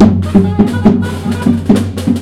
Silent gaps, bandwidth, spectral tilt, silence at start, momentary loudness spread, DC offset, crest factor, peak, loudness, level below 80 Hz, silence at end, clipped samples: none; 13.5 kHz; -8 dB/octave; 0 s; 5 LU; under 0.1%; 10 dB; 0 dBFS; -12 LUFS; -32 dBFS; 0 s; 1%